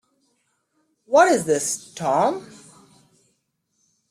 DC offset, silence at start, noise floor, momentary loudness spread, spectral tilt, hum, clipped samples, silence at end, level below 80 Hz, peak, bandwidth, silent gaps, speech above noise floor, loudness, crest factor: under 0.1%; 1.1 s; -72 dBFS; 10 LU; -3.5 dB/octave; none; under 0.1%; 1.65 s; -68 dBFS; -4 dBFS; 16 kHz; none; 52 dB; -20 LUFS; 20 dB